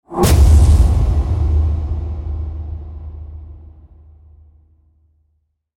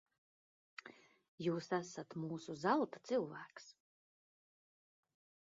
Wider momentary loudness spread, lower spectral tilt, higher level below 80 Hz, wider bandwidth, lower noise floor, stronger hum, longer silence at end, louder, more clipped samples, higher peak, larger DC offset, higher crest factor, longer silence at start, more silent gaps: about the same, 23 LU vs 21 LU; first, -6.5 dB/octave vs -5 dB/octave; first, -18 dBFS vs -88 dBFS; first, 16.5 kHz vs 7.4 kHz; about the same, -65 dBFS vs -62 dBFS; neither; first, 2.2 s vs 1.8 s; first, -15 LUFS vs -41 LUFS; neither; first, -2 dBFS vs -20 dBFS; neither; second, 14 dB vs 24 dB; second, 0.1 s vs 0.85 s; second, none vs 1.28-1.38 s